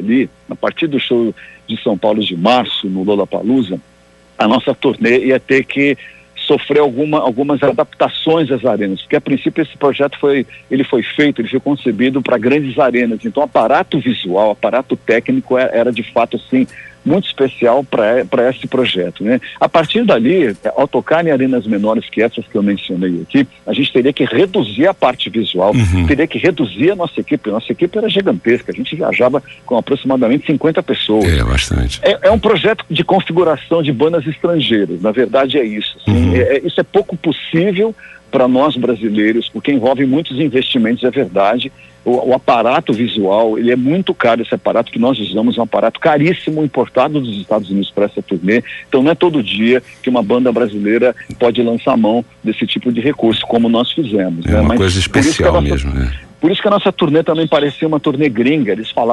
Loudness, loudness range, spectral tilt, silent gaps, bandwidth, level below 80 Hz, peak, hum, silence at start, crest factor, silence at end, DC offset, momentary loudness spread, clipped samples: -14 LUFS; 2 LU; -6 dB/octave; none; 11.5 kHz; -32 dBFS; -2 dBFS; none; 0 s; 12 dB; 0 s; under 0.1%; 5 LU; under 0.1%